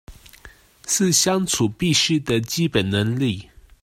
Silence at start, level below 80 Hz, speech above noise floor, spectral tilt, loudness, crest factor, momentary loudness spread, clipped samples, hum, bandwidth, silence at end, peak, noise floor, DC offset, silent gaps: 0.1 s; -48 dBFS; 27 dB; -3.5 dB/octave; -20 LUFS; 18 dB; 7 LU; under 0.1%; none; 16 kHz; 0.4 s; -4 dBFS; -47 dBFS; under 0.1%; none